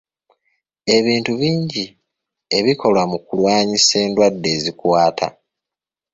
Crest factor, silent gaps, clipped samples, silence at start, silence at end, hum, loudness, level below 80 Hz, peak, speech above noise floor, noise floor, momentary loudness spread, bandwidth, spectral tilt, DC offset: 16 dB; none; under 0.1%; 0.85 s; 0.85 s; none; -17 LUFS; -56 dBFS; -2 dBFS; 71 dB; -87 dBFS; 11 LU; 8 kHz; -4 dB/octave; under 0.1%